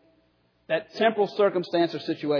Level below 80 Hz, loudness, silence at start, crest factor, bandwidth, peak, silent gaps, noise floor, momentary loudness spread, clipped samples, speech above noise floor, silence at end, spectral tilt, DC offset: -80 dBFS; -25 LUFS; 0.7 s; 16 dB; 5.4 kHz; -10 dBFS; none; -66 dBFS; 7 LU; under 0.1%; 42 dB; 0 s; -6.5 dB/octave; under 0.1%